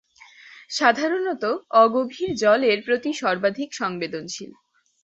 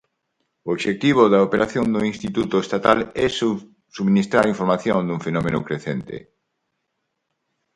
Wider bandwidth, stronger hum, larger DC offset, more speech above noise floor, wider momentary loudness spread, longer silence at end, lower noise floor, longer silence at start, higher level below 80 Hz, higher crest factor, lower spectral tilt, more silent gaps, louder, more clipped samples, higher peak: second, 8.2 kHz vs 11 kHz; neither; neither; second, 27 dB vs 56 dB; about the same, 13 LU vs 12 LU; second, 0.55 s vs 1.55 s; second, -49 dBFS vs -76 dBFS; second, 0.45 s vs 0.65 s; second, -68 dBFS vs -52 dBFS; about the same, 20 dB vs 20 dB; second, -3.5 dB/octave vs -6.5 dB/octave; neither; about the same, -22 LUFS vs -20 LUFS; neither; about the same, -2 dBFS vs 0 dBFS